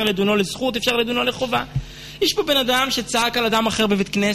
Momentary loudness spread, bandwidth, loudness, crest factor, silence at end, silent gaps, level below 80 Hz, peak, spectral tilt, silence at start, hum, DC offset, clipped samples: 5 LU; 13.5 kHz; -19 LUFS; 14 dB; 0 s; none; -44 dBFS; -6 dBFS; -3.5 dB/octave; 0 s; none; under 0.1%; under 0.1%